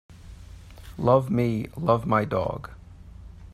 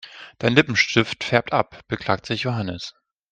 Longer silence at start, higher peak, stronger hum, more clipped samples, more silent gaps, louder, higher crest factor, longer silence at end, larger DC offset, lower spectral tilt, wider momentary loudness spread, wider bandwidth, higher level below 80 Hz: about the same, 0.1 s vs 0.05 s; second, -6 dBFS vs 0 dBFS; neither; neither; neither; second, -24 LUFS vs -21 LUFS; about the same, 20 dB vs 22 dB; second, 0.05 s vs 0.4 s; neither; first, -8.5 dB/octave vs -5 dB/octave; first, 25 LU vs 13 LU; first, 14 kHz vs 9.2 kHz; first, -46 dBFS vs -54 dBFS